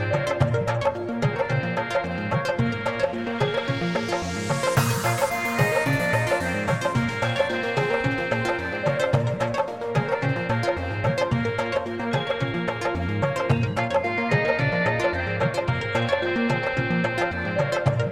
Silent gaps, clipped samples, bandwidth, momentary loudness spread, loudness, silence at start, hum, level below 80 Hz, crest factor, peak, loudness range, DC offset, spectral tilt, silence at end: none; under 0.1%; 16.5 kHz; 4 LU; -24 LUFS; 0 s; none; -48 dBFS; 16 dB; -6 dBFS; 2 LU; 0.1%; -6 dB/octave; 0 s